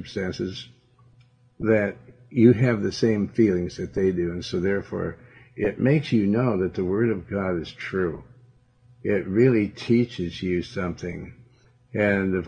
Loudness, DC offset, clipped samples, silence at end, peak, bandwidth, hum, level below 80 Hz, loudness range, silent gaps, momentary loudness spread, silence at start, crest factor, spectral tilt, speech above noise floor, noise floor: -24 LUFS; under 0.1%; under 0.1%; 0 s; -4 dBFS; 9.2 kHz; none; -54 dBFS; 3 LU; none; 12 LU; 0 s; 20 dB; -7.5 dB/octave; 34 dB; -57 dBFS